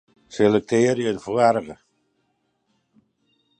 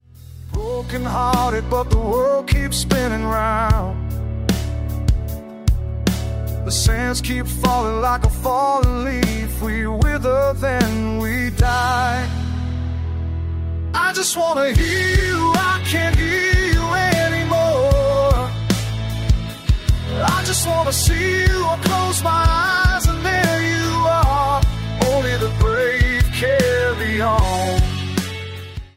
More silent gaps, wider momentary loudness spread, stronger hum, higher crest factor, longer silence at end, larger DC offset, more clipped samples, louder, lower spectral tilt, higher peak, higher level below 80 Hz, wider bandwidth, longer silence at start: neither; first, 12 LU vs 8 LU; neither; about the same, 20 dB vs 16 dB; first, 1.85 s vs 0.1 s; neither; neither; about the same, -20 LUFS vs -19 LUFS; about the same, -6 dB/octave vs -5 dB/octave; about the same, -4 dBFS vs -2 dBFS; second, -62 dBFS vs -24 dBFS; second, 9.6 kHz vs 16.5 kHz; about the same, 0.3 s vs 0.2 s